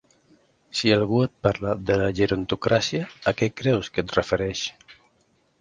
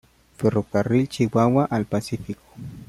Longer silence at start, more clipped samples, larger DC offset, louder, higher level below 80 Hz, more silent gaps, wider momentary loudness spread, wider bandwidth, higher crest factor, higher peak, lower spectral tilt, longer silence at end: first, 0.75 s vs 0.4 s; neither; neither; about the same, -24 LUFS vs -22 LUFS; about the same, -48 dBFS vs -52 dBFS; neither; second, 6 LU vs 15 LU; second, 9.8 kHz vs 14.5 kHz; about the same, 22 dB vs 18 dB; about the same, -2 dBFS vs -4 dBFS; second, -5.5 dB/octave vs -7.5 dB/octave; first, 0.7 s vs 0.05 s